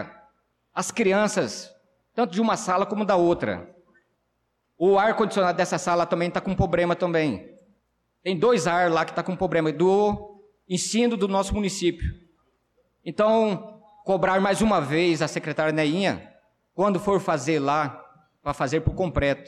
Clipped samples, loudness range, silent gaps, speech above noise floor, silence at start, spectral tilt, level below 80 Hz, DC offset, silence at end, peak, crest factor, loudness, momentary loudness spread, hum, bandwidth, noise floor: under 0.1%; 3 LU; none; 51 dB; 0 s; -5 dB/octave; -44 dBFS; under 0.1%; 0.05 s; -12 dBFS; 12 dB; -24 LUFS; 13 LU; none; 13.5 kHz; -74 dBFS